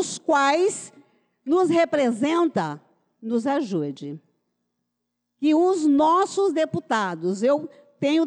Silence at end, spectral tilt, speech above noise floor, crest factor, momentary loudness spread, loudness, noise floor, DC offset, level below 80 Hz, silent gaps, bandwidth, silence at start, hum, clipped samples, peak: 0 s; -5 dB/octave; 58 dB; 10 dB; 18 LU; -22 LUFS; -80 dBFS; under 0.1%; -74 dBFS; none; 10.5 kHz; 0 s; none; under 0.1%; -12 dBFS